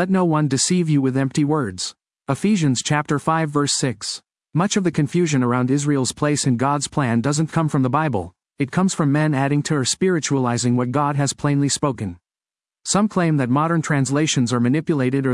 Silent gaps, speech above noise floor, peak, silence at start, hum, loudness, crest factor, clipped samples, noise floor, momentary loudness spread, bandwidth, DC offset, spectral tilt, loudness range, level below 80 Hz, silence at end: none; over 71 dB; -4 dBFS; 0 s; none; -20 LUFS; 16 dB; under 0.1%; under -90 dBFS; 7 LU; 12 kHz; under 0.1%; -5 dB/octave; 1 LU; -58 dBFS; 0 s